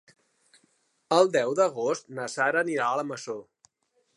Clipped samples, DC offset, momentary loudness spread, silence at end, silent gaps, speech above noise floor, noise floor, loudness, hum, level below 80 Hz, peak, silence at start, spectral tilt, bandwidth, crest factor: under 0.1%; under 0.1%; 13 LU; 0.75 s; none; 47 dB; -72 dBFS; -26 LUFS; none; -84 dBFS; -6 dBFS; 1.1 s; -4 dB/octave; 11.5 kHz; 22 dB